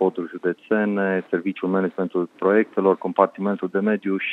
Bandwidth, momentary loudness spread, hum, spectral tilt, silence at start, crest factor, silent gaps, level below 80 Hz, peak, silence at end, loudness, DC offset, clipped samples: 4.2 kHz; 6 LU; none; -9 dB/octave; 0 s; 20 dB; none; -80 dBFS; -2 dBFS; 0 s; -22 LUFS; under 0.1%; under 0.1%